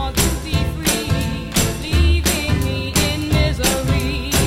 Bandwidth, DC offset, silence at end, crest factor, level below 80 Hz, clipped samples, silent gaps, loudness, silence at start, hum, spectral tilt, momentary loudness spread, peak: 16.5 kHz; under 0.1%; 0 s; 14 dB; -24 dBFS; under 0.1%; none; -18 LUFS; 0 s; none; -4 dB/octave; 4 LU; -4 dBFS